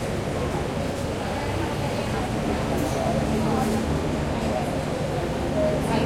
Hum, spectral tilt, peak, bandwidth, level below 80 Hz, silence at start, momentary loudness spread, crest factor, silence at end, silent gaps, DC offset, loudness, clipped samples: none; -6 dB/octave; -12 dBFS; 16.5 kHz; -38 dBFS; 0 s; 4 LU; 14 dB; 0 s; none; under 0.1%; -26 LUFS; under 0.1%